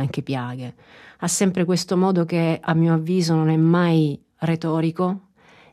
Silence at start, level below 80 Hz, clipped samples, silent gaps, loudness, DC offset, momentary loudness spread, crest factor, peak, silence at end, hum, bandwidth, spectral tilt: 0 s; -64 dBFS; under 0.1%; none; -21 LUFS; under 0.1%; 10 LU; 14 dB; -6 dBFS; 0.55 s; none; 13.5 kHz; -6 dB/octave